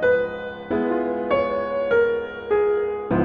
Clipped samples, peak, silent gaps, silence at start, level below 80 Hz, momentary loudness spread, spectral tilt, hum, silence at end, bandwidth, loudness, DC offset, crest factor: under 0.1%; -8 dBFS; none; 0 s; -50 dBFS; 7 LU; -8.5 dB/octave; none; 0 s; 4.9 kHz; -23 LUFS; under 0.1%; 14 dB